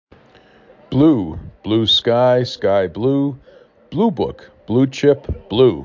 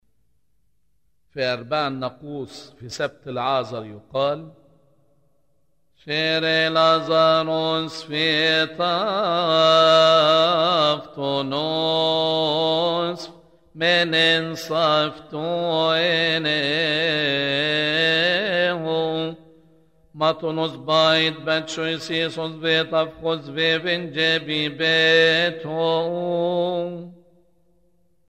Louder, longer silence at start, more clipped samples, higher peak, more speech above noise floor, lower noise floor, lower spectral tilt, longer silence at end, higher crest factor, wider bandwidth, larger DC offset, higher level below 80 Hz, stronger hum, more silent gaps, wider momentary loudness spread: first, -17 LUFS vs -20 LUFS; second, 0.9 s vs 1.35 s; neither; first, -2 dBFS vs -6 dBFS; second, 32 dB vs 50 dB; second, -49 dBFS vs -71 dBFS; first, -7 dB/octave vs -4.5 dB/octave; second, 0 s vs 1.15 s; about the same, 16 dB vs 16 dB; second, 7.6 kHz vs 13 kHz; neither; first, -40 dBFS vs -64 dBFS; neither; neither; about the same, 11 LU vs 12 LU